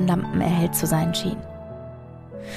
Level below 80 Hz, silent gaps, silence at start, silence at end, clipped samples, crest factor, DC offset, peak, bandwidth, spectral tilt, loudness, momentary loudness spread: -46 dBFS; none; 0 s; 0 s; under 0.1%; 16 dB; under 0.1%; -8 dBFS; 15.5 kHz; -5.5 dB/octave; -23 LUFS; 18 LU